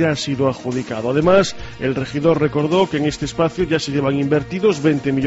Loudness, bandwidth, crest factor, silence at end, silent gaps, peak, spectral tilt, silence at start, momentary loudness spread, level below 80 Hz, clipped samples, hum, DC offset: -18 LUFS; 8 kHz; 16 dB; 0 s; none; -2 dBFS; -5.5 dB/octave; 0 s; 8 LU; -42 dBFS; under 0.1%; none; under 0.1%